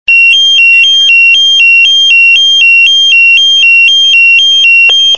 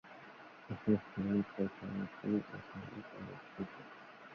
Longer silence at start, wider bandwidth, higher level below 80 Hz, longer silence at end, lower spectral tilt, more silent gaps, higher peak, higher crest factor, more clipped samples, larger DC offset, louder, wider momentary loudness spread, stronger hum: about the same, 0.1 s vs 0.05 s; first, 9.2 kHz vs 6.2 kHz; first, -54 dBFS vs -68 dBFS; about the same, 0 s vs 0 s; second, 4.5 dB/octave vs -7.5 dB/octave; neither; first, 0 dBFS vs -18 dBFS; second, 4 dB vs 22 dB; first, 7% vs under 0.1%; first, 2% vs under 0.1%; first, -1 LUFS vs -40 LUFS; second, 1 LU vs 19 LU; neither